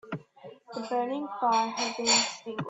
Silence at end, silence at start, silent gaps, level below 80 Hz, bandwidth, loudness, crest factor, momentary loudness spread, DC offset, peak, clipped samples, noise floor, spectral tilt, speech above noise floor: 0 s; 0.05 s; none; -74 dBFS; 8.4 kHz; -27 LUFS; 20 dB; 17 LU; under 0.1%; -10 dBFS; under 0.1%; -50 dBFS; -2 dB/octave; 22 dB